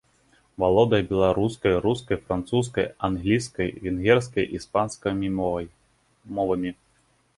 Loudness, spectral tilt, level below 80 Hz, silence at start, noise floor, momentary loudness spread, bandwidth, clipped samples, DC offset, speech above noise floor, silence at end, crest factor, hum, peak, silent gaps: -24 LUFS; -6.5 dB/octave; -46 dBFS; 0.6 s; -64 dBFS; 8 LU; 11.5 kHz; under 0.1%; under 0.1%; 41 dB; 0.65 s; 20 dB; none; -6 dBFS; none